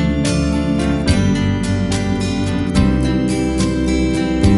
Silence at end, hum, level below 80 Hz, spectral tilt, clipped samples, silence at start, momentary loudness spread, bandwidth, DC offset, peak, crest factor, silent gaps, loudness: 0 s; none; -24 dBFS; -6 dB/octave; under 0.1%; 0 s; 3 LU; 11.5 kHz; under 0.1%; -2 dBFS; 14 dB; none; -17 LUFS